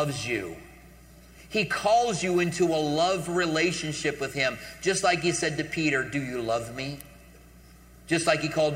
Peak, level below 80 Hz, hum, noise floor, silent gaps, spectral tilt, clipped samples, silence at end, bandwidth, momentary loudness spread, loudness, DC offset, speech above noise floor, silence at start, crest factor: -8 dBFS; -54 dBFS; none; -51 dBFS; none; -4 dB/octave; under 0.1%; 0 s; 16 kHz; 8 LU; -26 LUFS; under 0.1%; 25 dB; 0 s; 20 dB